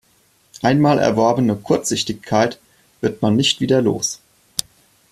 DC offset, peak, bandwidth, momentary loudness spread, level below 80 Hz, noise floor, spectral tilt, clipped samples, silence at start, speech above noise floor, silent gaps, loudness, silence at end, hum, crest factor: under 0.1%; 0 dBFS; 15.5 kHz; 11 LU; -54 dBFS; -58 dBFS; -4.5 dB/octave; under 0.1%; 0.55 s; 41 dB; none; -18 LUFS; 0.5 s; none; 18 dB